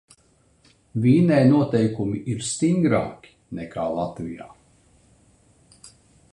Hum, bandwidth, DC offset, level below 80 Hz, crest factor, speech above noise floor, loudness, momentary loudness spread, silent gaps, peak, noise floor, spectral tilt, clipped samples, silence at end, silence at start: none; 11 kHz; under 0.1%; -56 dBFS; 18 dB; 40 dB; -21 LUFS; 18 LU; none; -4 dBFS; -60 dBFS; -6.5 dB/octave; under 0.1%; 0.45 s; 0.95 s